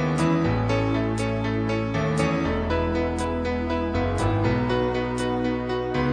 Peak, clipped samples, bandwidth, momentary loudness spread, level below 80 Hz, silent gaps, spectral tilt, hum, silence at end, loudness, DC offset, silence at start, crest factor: -10 dBFS; under 0.1%; 10 kHz; 3 LU; -36 dBFS; none; -7 dB/octave; none; 0 s; -24 LUFS; 0.1%; 0 s; 14 dB